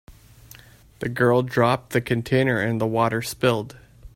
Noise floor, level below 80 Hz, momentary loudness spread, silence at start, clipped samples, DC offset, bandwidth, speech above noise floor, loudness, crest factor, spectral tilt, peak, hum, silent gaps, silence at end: -48 dBFS; -52 dBFS; 9 LU; 0.1 s; under 0.1%; under 0.1%; 16.5 kHz; 27 dB; -22 LUFS; 18 dB; -6 dB/octave; -6 dBFS; none; none; 0.05 s